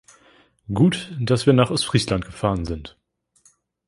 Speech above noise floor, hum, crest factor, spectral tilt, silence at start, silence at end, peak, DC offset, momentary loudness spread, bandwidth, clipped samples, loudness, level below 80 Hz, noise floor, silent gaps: 40 dB; none; 20 dB; -6 dB/octave; 0.7 s; 1 s; -2 dBFS; under 0.1%; 13 LU; 11.5 kHz; under 0.1%; -21 LUFS; -42 dBFS; -60 dBFS; none